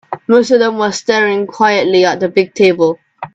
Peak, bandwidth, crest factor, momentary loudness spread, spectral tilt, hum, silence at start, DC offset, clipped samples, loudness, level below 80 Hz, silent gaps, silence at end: 0 dBFS; 8 kHz; 12 dB; 5 LU; -4.5 dB/octave; none; 0.1 s; under 0.1%; under 0.1%; -12 LUFS; -58 dBFS; none; 0.1 s